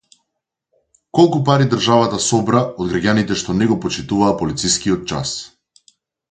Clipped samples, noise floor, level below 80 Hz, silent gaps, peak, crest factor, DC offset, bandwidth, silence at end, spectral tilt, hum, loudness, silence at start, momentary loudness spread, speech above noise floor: under 0.1%; -78 dBFS; -46 dBFS; none; 0 dBFS; 18 dB; under 0.1%; 9.6 kHz; 0.85 s; -5 dB/octave; none; -17 LUFS; 1.15 s; 8 LU; 62 dB